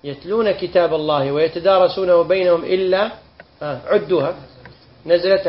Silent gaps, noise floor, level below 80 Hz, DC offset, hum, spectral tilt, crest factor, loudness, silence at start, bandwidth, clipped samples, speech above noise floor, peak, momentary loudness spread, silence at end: none; -44 dBFS; -52 dBFS; under 0.1%; none; -10 dB/octave; 16 dB; -17 LUFS; 0.05 s; 5.8 kHz; under 0.1%; 27 dB; -2 dBFS; 12 LU; 0 s